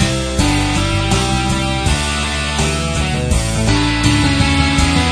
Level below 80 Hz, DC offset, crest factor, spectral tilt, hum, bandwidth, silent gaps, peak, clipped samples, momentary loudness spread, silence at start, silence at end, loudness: -22 dBFS; under 0.1%; 14 dB; -4.5 dB/octave; none; 11 kHz; none; 0 dBFS; under 0.1%; 4 LU; 0 s; 0 s; -15 LUFS